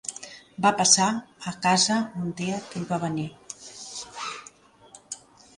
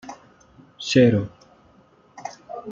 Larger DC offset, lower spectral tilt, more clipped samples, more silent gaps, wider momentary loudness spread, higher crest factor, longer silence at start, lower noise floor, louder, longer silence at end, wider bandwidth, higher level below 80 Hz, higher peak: neither; second, -2.5 dB/octave vs -6 dB/octave; neither; neither; about the same, 21 LU vs 22 LU; about the same, 22 dB vs 22 dB; about the same, 0.05 s vs 0.05 s; about the same, -53 dBFS vs -55 dBFS; second, -24 LUFS vs -19 LUFS; first, 0.4 s vs 0 s; first, 11.5 kHz vs 7.6 kHz; second, -66 dBFS vs -60 dBFS; about the same, -4 dBFS vs -4 dBFS